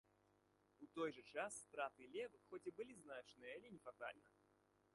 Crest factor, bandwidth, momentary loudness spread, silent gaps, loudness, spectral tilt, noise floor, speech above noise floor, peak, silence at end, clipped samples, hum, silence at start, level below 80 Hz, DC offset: 20 dB; 11.5 kHz; 9 LU; none; -53 LUFS; -3.5 dB/octave; -80 dBFS; 27 dB; -34 dBFS; 0.65 s; under 0.1%; 50 Hz at -85 dBFS; 0.8 s; under -90 dBFS; under 0.1%